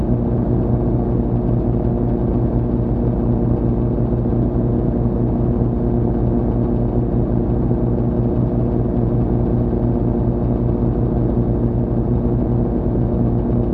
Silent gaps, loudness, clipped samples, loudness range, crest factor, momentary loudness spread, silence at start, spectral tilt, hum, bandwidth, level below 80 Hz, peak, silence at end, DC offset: none; -18 LUFS; under 0.1%; 0 LU; 14 dB; 1 LU; 0 s; -13.5 dB/octave; none; 2.7 kHz; -24 dBFS; -4 dBFS; 0 s; under 0.1%